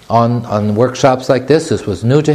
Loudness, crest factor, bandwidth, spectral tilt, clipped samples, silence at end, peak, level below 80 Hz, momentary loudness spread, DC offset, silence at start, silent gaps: -13 LUFS; 12 dB; 13.5 kHz; -6.5 dB/octave; 0.2%; 0 s; 0 dBFS; -46 dBFS; 4 LU; under 0.1%; 0.1 s; none